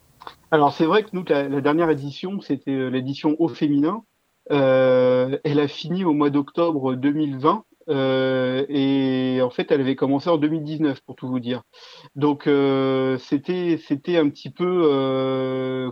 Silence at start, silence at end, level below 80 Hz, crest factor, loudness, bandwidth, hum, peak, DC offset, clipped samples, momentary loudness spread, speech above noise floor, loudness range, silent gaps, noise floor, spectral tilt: 0.25 s; 0 s; -68 dBFS; 20 dB; -21 LUFS; 6.6 kHz; none; -2 dBFS; under 0.1%; under 0.1%; 8 LU; 24 dB; 3 LU; none; -44 dBFS; -8 dB/octave